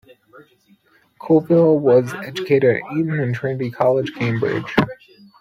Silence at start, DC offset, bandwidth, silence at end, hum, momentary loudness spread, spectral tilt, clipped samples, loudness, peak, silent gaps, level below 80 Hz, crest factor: 0.35 s; under 0.1%; 15 kHz; 0.45 s; none; 10 LU; -8 dB/octave; under 0.1%; -18 LUFS; -2 dBFS; none; -56 dBFS; 18 dB